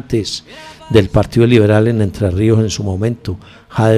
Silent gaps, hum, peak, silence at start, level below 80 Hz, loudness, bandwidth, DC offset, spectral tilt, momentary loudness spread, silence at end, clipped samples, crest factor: none; none; 0 dBFS; 0.1 s; -32 dBFS; -14 LUFS; 12.5 kHz; under 0.1%; -7 dB/octave; 16 LU; 0 s; under 0.1%; 14 dB